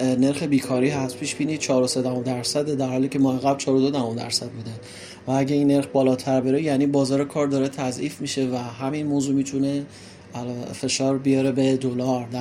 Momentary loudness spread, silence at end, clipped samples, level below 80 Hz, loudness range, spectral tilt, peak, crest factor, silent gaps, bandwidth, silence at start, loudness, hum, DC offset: 11 LU; 0 s; under 0.1%; -62 dBFS; 3 LU; -5.5 dB/octave; -8 dBFS; 16 dB; none; 13.5 kHz; 0 s; -23 LUFS; none; under 0.1%